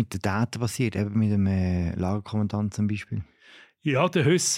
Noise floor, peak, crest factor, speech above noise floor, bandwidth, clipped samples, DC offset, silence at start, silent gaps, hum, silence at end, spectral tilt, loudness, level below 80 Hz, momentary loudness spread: -53 dBFS; -8 dBFS; 18 dB; 29 dB; 16 kHz; under 0.1%; under 0.1%; 0 s; none; none; 0 s; -5.5 dB/octave; -26 LUFS; -50 dBFS; 10 LU